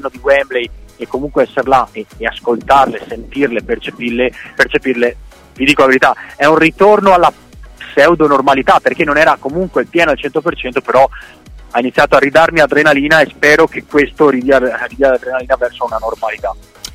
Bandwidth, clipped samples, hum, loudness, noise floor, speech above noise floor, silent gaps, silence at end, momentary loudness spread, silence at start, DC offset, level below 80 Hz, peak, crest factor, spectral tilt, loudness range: 16 kHz; under 0.1%; none; -12 LUFS; -33 dBFS; 21 dB; none; 0.05 s; 11 LU; 0 s; under 0.1%; -38 dBFS; 0 dBFS; 12 dB; -5 dB/octave; 5 LU